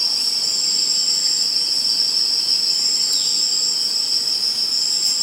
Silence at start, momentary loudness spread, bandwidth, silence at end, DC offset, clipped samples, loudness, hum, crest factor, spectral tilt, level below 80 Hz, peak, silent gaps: 0 s; 2 LU; 16 kHz; 0 s; under 0.1%; under 0.1%; -16 LUFS; none; 14 dB; 2 dB/octave; -72 dBFS; -6 dBFS; none